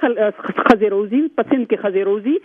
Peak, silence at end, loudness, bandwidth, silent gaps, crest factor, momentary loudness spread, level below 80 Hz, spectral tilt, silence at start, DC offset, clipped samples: 0 dBFS; 0.05 s; -17 LUFS; 7.6 kHz; none; 16 dB; 5 LU; -52 dBFS; -7 dB/octave; 0 s; under 0.1%; under 0.1%